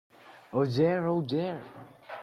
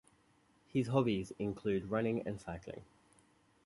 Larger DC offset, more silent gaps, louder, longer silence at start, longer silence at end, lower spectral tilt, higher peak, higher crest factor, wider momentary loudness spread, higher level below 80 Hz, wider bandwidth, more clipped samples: neither; neither; first, -29 LUFS vs -37 LUFS; second, 0.25 s vs 0.75 s; second, 0 s vs 0.85 s; about the same, -8 dB/octave vs -7.5 dB/octave; first, -14 dBFS vs -18 dBFS; second, 16 dB vs 22 dB; first, 20 LU vs 14 LU; second, -70 dBFS vs -64 dBFS; about the same, 12 kHz vs 11.5 kHz; neither